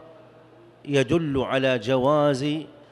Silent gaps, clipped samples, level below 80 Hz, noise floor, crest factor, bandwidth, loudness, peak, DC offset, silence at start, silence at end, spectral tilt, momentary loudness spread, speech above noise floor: none; under 0.1%; -56 dBFS; -51 dBFS; 16 dB; 12 kHz; -23 LUFS; -8 dBFS; under 0.1%; 0 s; 0.25 s; -6.5 dB/octave; 8 LU; 29 dB